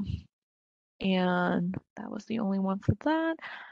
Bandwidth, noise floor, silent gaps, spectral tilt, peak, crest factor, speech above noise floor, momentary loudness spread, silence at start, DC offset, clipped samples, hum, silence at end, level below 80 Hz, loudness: 7.2 kHz; under -90 dBFS; 0.33-0.99 s, 1.90-1.96 s; -8 dB/octave; -10 dBFS; 20 dB; over 60 dB; 13 LU; 0 s; under 0.1%; under 0.1%; none; 0 s; -50 dBFS; -30 LUFS